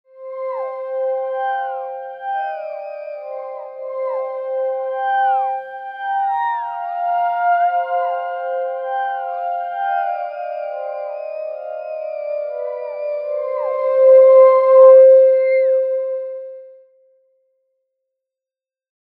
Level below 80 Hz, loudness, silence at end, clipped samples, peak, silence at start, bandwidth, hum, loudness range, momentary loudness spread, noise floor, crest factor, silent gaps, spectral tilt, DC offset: under -90 dBFS; -17 LUFS; 2.35 s; under 0.1%; 0 dBFS; 0.15 s; 3.9 kHz; none; 14 LU; 19 LU; under -90 dBFS; 18 dB; none; -3 dB/octave; under 0.1%